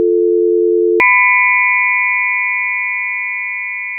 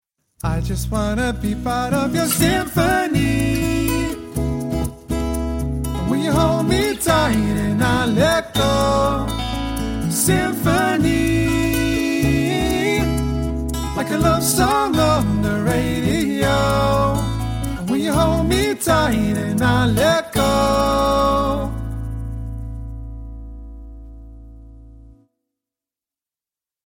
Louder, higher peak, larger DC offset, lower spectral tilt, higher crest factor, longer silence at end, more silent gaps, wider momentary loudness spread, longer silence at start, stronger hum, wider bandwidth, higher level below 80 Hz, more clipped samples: first, -12 LUFS vs -19 LUFS; about the same, 0 dBFS vs -2 dBFS; neither; second, 5.5 dB/octave vs -5 dB/octave; about the same, 12 dB vs 16 dB; second, 0 s vs 1.85 s; neither; about the same, 9 LU vs 8 LU; second, 0 s vs 0.45 s; neither; second, 3.7 kHz vs 17 kHz; second, -64 dBFS vs -30 dBFS; neither